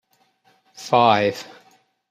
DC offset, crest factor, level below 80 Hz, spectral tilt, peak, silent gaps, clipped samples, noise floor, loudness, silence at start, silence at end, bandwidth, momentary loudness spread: under 0.1%; 22 dB; -68 dBFS; -5 dB/octave; -2 dBFS; none; under 0.1%; -62 dBFS; -18 LUFS; 0.8 s; 0.65 s; 15 kHz; 22 LU